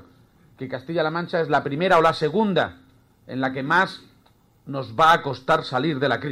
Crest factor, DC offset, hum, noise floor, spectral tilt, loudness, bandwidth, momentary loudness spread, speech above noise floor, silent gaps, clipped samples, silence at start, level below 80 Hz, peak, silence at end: 18 dB; under 0.1%; none; -58 dBFS; -6 dB/octave; -21 LUFS; 16 kHz; 16 LU; 36 dB; none; under 0.1%; 0.6 s; -58 dBFS; -4 dBFS; 0 s